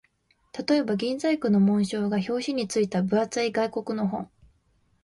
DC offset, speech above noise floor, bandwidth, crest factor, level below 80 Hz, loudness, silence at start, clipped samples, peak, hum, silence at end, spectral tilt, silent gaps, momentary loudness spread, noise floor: under 0.1%; 42 dB; 11.5 kHz; 14 dB; -64 dBFS; -26 LUFS; 0.55 s; under 0.1%; -12 dBFS; none; 0.8 s; -6 dB/octave; none; 8 LU; -67 dBFS